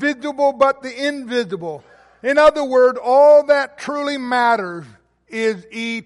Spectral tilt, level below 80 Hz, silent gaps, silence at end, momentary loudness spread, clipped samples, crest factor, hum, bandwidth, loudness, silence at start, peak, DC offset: -4.5 dB/octave; -56 dBFS; none; 0.05 s; 15 LU; under 0.1%; 14 dB; none; 11.5 kHz; -17 LUFS; 0 s; -2 dBFS; under 0.1%